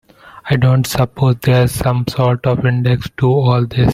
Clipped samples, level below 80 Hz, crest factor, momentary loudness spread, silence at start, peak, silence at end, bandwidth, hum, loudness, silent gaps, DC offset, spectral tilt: under 0.1%; -36 dBFS; 14 dB; 4 LU; 0.25 s; 0 dBFS; 0 s; 15.5 kHz; none; -15 LUFS; none; under 0.1%; -7 dB/octave